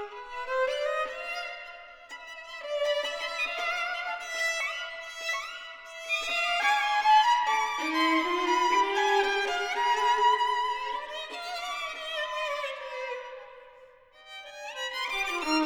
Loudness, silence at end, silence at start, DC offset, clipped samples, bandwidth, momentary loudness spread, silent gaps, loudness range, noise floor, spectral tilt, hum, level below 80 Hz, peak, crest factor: -28 LUFS; 0 s; 0 s; under 0.1%; under 0.1%; over 20 kHz; 17 LU; none; 10 LU; -54 dBFS; 0 dB/octave; none; -64 dBFS; -12 dBFS; 18 dB